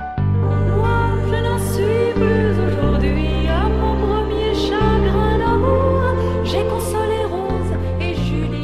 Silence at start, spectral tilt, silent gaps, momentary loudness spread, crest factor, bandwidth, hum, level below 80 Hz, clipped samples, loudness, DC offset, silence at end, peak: 0 s; -7 dB/octave; none; 5 LU; 14 dB; 14 kHz; none; -24 dBFS; under 0.1%; -18 LUFS; 2%; 0 s; -4 dBFS